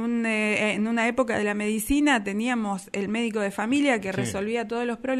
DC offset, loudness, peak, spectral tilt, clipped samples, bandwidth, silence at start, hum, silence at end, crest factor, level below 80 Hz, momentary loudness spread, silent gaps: under 0.1%; -25 LUFS; -10 dBFS; -4.5 dB/octave; under 0.1%; 15 kHz; 0 s; none; 0 s; 16 dB; -50 dBFS; 6 LU; none